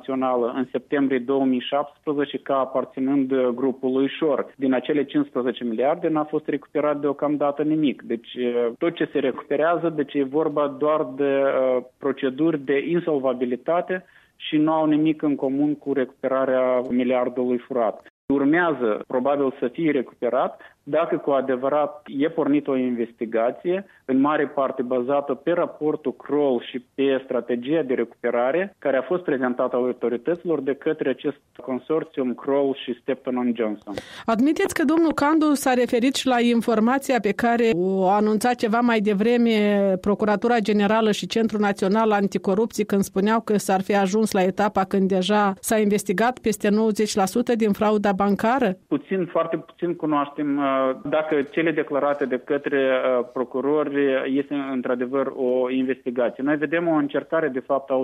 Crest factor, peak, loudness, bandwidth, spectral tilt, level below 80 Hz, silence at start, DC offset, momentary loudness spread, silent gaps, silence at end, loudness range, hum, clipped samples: 14 dB; -8 dBFS; -22 LUFS; 15 kHz; -5.5 dB/octave; -62 dBFS; 0.05 s; under 0.1%; 6 LU; 18.10-18.28 s; 0 s; 4 LU; none; under 0.1%